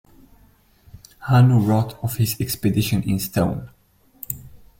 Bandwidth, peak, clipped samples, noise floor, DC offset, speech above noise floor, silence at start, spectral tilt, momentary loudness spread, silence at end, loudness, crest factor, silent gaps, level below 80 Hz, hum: 16.5 kHz; -4 dBFS; under 0.1%; -55 dBFS; under 0.1%; 36 dB; 0.95 s; -6.5 dB/octave; 17 LU; 0.25 s; -20 LUFS; 18 dB; none; -46 dBFS; none